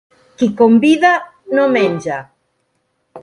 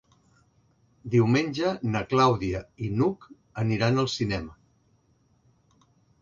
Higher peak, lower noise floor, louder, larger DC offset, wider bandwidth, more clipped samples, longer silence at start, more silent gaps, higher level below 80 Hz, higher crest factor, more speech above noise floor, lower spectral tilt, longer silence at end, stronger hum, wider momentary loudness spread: first, 0 dBFS vs -8 dBFS; about the same, -66 dBFS vs -65 dBFS; first, -14 LUFS vs -26 LUFS; neither; first, 11 kHz vs 7.6 kHz; neither; second, 0.4 s vs 1.05 s; neither; second, -60 dBFS vs -52 dBFS; second, 14 dB vs 20 dB; first, 54 dB vs 40 dB; about the same, -6 dB/octave vs -6.5 dB/octave; second, 0 s vs 1.7 s; neither; about the same, 12 LU vs 14 LU